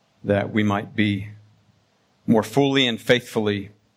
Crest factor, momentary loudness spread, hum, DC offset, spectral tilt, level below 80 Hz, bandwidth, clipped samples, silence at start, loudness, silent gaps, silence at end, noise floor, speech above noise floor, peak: 20 dB; 11 LU; none; under 0.1%; -5.5 dB/octave; -62 dBFS; 15.5 kHz; under 0.1%; 0.25 s; -21 LUFS; none; 0.3 s; -63 dBFS; 42 dB; -2 dBFS